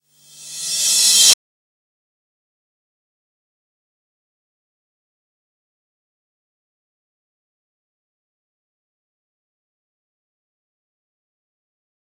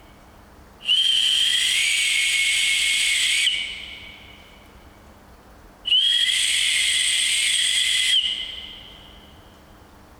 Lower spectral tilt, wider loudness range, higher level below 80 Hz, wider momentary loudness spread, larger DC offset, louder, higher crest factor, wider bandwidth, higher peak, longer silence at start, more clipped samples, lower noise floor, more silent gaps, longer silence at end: about the same, 3.5 dB/octave vs 3 dB/octave; about the same, 3 LU vs 5 LU; second, under -90 dBFS vs -54 dBFS; about the same, 17 LU vs 15 LU; neither; first, -12 LUFS vs -18 LUFS; first, 26 dB vs 16 dB; second, 16.5 kHz vs over 20 kHz; first, 0 dBFS vs -6 dBFS; second, 0.4 s vs 0.8 s; neither; second, -42 dBFS vs -48 dBFS; neither; first, 10.65 s vs 1 s